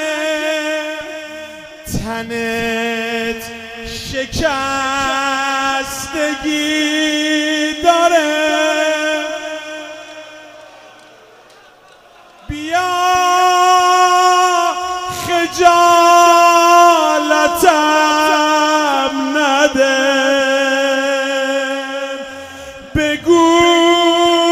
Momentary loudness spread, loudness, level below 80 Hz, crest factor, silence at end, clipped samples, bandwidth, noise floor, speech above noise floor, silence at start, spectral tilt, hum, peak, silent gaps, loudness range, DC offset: 17 LU; -13 LUFS; -42 dBFS; 14 dB; 0 s; under 0.1%; 16 kHz; -44 dBFS; 25 dB; 0 s; -2.5 dB/octave; none; 0 dBFS; none; 11 LU; under 0.1%